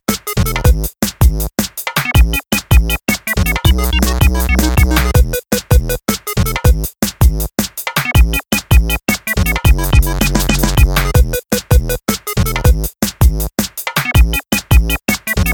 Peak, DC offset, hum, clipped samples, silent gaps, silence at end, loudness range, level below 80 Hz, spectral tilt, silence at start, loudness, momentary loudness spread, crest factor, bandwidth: 0 dBFS; under 0.1%; none; under 0.1%; none; 0 s; 2 LU; -16 dBFS; -4.5 dB/octave; 0.1 s; -14 LUFS; 5 LU; 12 dB; 19.5 kHz